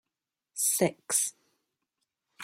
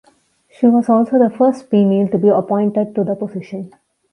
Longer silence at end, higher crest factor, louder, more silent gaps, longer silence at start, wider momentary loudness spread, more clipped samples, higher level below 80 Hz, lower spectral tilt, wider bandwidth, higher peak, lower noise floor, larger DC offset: second, 0 s vs 0.45 s; first, 22 dB vs 14 dB; second, -28 LUFS vs -15 LUFS; neither; about the same, 0.55 s vs 0.6 s; second, 8 LU vs 14 LU; neither; second, -82 dBFS vs -62 dBFS; second, -2.5 dB/octave vs -9.5 dB/octave; first, 16.5 kHz vs 10 kHz; second, -12 dBFS vs -2 dBFS; first, -89 dBFS vs -55 dBFS; neither